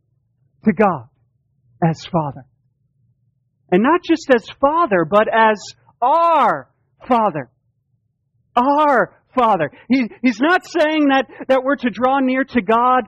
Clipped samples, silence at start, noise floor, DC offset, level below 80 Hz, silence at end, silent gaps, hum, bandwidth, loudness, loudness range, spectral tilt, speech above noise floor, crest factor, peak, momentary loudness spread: under 0.1%; 0.65 s; -67 dBFS; under 0.1%; -56 dBFS; 0 s; none; none; 8.6 kHz; -17 LUFS; 6 LU; -6.5 dB/octave; 51 dB; 16 dB; 0 dBFS; 7 LU